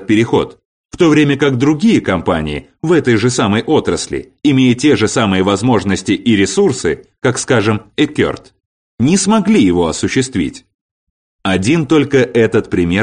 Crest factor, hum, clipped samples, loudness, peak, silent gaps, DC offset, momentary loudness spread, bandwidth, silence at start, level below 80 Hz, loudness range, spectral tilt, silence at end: 12 dB; none; under 0.1%; -13 LUFS; -2 dBFS; 0.65-0.89 s, 8.66-8.98 s, 10.74-11.39 s; under 0.1%; 7 LU; 10 kHz; 0 s; -42 dBFS; 2 LU; -5.5 dB/octave; 0 s